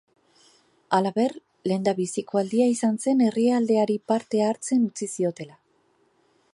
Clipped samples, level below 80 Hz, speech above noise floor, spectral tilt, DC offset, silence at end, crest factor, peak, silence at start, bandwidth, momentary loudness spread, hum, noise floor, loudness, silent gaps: under 0.1%; -76 dBFS; 42 dB; -5.5 dB/octave; under 0.1%; 1.05 s; 18 dB; -6 dBFS; 0.9 s; 11.5 kHz; 7 LU; none; -65 dBFS; -24 LUFS; none